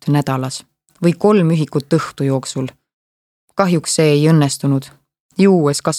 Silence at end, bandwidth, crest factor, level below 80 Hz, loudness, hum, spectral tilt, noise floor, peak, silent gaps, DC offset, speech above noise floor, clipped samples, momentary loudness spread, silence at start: 0 s; 14.5 kHz; 16 dB; -60 dBFS; -16 LUFS; none; -6 dB/octave; under -90 dBFS; 0 dBFS; 2.94-3.48 s, 5.20-5.29 s; under 0.1%; over 75 dB; under 0.1%; 13 LU; 0.05 s